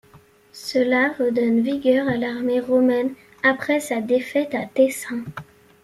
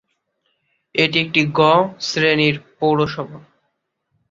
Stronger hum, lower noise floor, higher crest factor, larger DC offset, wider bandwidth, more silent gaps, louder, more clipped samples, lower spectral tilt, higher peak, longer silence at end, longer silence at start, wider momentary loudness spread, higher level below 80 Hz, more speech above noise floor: neither; second, -52 dBFS vs -72 dBFS; about the same, 18 dB vs 18 dB; neither; first, 14.5 kHz vs 7.8 kHz; neither; second, -21 LUFS vs -17 LUFS; neither; about the same, -5 dB/octave vs -5 dB/octave; about the same, -4 dBFS vs -2 dBFS; second, 0.4 s vs 0.9 s; second, 0.15 s vs 0.95 s; about the same, 10 LU vs 9 LU; about the same, -62 dBFS vs -58 dBFS; second, 31 dB vs 55 dB